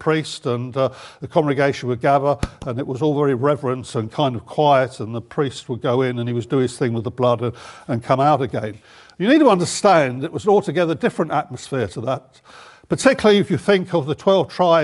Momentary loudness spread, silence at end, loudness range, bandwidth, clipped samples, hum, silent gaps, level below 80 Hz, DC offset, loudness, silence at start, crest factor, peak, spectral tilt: 11 LU; 0 s; 3 LU; 11.5 kHz; under 0.1%; none; none; -50 dBFS; under 0.1%; -19 LUFS; 0 s; 18 dB; 0 dBFS; -6 dB/octave